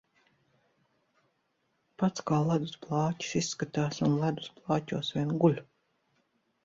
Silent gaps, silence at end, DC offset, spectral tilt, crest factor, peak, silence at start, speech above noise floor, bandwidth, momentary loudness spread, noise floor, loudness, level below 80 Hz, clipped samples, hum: none; 1 s; under 0.1%; -6 dB/octave; 20 dB; -12 dBFS; 2 s; 47 dB; 7.8 kHz; 6 LU; -76 dBFS; -31 LUFS; -68 dBFS; under 0.1%; none